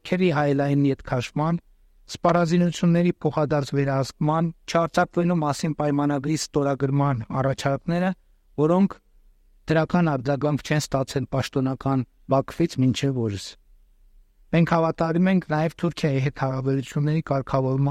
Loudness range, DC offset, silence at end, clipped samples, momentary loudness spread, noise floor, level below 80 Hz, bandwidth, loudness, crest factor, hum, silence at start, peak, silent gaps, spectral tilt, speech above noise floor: 2 LU; under 0.1%; 0 s; under 0.1%; 6 LU; -56 dBFS; -50 dBFS; 13 kHz; -23 LUFS; 16 dB; none; 0.05 s; -6 dBFS; none; -7 dB/octave; 33 dB